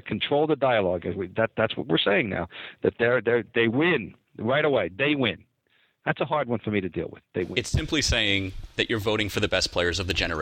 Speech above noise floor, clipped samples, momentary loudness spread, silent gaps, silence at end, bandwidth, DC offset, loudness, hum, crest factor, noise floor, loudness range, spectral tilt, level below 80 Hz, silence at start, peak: 42 dB; under 0.1%; 10 LU; none; 0 s; 16.5 kHz; under 0.1%; -25 LUFS; none; 18 dB; -67 dBFS; 3 LU; -4.5 dB/octave; -44 dBFS; 0.05 s; -8 dBFS